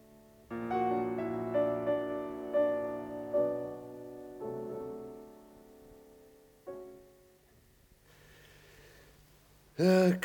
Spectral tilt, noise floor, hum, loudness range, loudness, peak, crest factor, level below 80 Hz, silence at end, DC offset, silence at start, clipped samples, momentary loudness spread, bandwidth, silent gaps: -7 dB/octave; -64 dBFS; none; 21 LU; -33 LUFS; -14 dBFS; 20 dB; -68 dBFS; 0 s; under 0.1%; 0.1 s; under 0.1%; 18 LU; 18.5 kHz; none